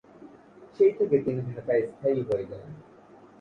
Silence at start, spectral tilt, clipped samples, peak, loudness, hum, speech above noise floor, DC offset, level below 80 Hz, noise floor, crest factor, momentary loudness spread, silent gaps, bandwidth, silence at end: 0.2 s; -9.5 dB/octave; under 0.1%; -10 dBFS; -26 LUFS; none; 26 dB; under 0.1%; -64 dBFS; -52 dBFS; 18 dB; 19 LU; none; 5.4 kHz; 0.6 s